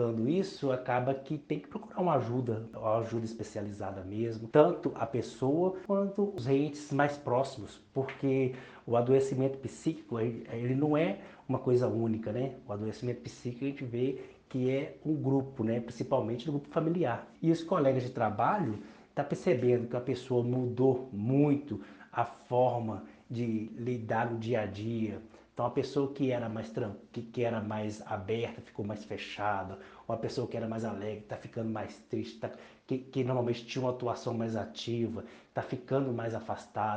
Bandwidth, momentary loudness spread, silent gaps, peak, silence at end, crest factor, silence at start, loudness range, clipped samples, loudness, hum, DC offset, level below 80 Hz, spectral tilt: 9.2 kHz; 11 LU; none; -8 dBFS; 0 s; 24 dB; 0 s; 6 LU; under 0.1%; -33 LUFS; none; under 0.1%; -68 dBFS; -7.5 dB/octave